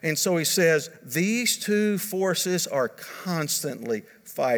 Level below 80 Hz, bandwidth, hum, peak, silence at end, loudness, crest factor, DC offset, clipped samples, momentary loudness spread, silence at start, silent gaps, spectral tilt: -78 dBFS; over 20 kHz; none; -8 dBFS; 0 s; -25 LUFS; 18 dB; under 0.1%; under 0.1%; 10 LU; 0.05 s; none; -3.5 dB/octave